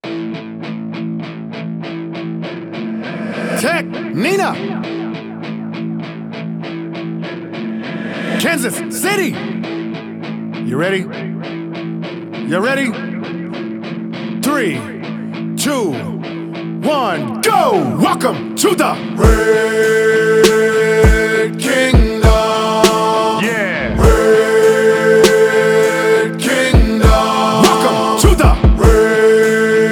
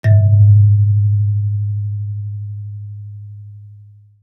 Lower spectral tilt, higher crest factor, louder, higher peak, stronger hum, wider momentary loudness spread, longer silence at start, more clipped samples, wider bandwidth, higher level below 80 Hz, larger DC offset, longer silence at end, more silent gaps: second, -5 dB/octave vs -11 dB/octave; about the same, 14 dB vs 12 dB; about the same, -14 LUFS vs -14 LUFS; about the same, 0 dBFS vs -2 dBFS; neither; second, 14 LU vs 23 LU; about the same, 0.05 s vs 0.05 s; neither; first, 19 kHz vs 2 kHz; first, -22 dBFS vs -52 dBFS; neither; second, 0 s vs 0.5 s; neither